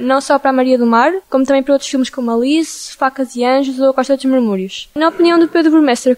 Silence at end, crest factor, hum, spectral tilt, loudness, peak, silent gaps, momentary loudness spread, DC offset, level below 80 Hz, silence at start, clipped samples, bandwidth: 0 s; 12 dB; none; -4 dB/octave; -13 LUFS; -2 dBFS; none; 7 LU; under 0.1%; -56 dBFS; 0 s; under 0.1%; 15 kHz